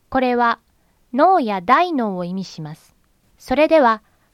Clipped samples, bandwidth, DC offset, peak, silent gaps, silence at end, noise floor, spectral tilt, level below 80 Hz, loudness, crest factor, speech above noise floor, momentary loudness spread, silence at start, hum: under 0.1%; 14 kHz; under 0.1%; -2 dBFS; none; 0.35 s; -57 dBFS; -6 dB/octave; -52 dBFS; -18 LUFS; 18 dB; 40 dB; 14 LU; 0.1 s; none